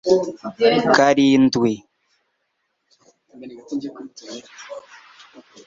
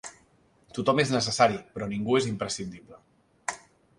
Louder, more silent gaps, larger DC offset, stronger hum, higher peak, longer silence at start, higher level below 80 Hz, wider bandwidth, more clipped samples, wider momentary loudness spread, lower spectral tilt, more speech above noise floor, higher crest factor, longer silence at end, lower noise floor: first, -17 LUFS vs -27 LUFS; neither; neither; neither; first, -2 dBFS vs -6 dBFS; about the same, 0.05 s vs 0.05 s; about the same, -60 dBFS vs -60 dBFS; second, 7.6 kHz vs 11.5 kHz; neither; first, 23 LU vs 17 LU; about the same, -5 dB/octave vs -4.5 dB/octave; first, 54 dB vs 36 dB; about the same, 20 dB vs 22 dB; first, 0.85 s vs 0.4 s; first, -73 dBFS vs -63 dBFS